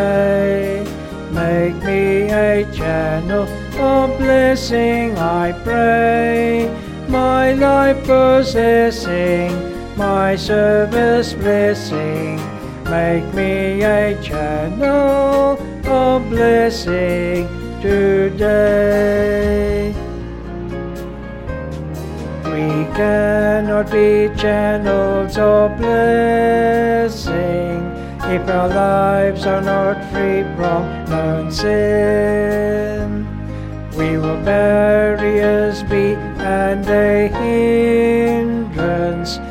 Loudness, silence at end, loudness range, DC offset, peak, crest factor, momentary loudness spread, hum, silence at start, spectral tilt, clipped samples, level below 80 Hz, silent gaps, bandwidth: -16 LUFS; 0 s; 3 LU; under 0.1%; -2 dBFS; 14 dB; 11 LU; none; 0 s; -6.5 dB/octave; under 0.1%; -32 dBFS; none; 16 kHz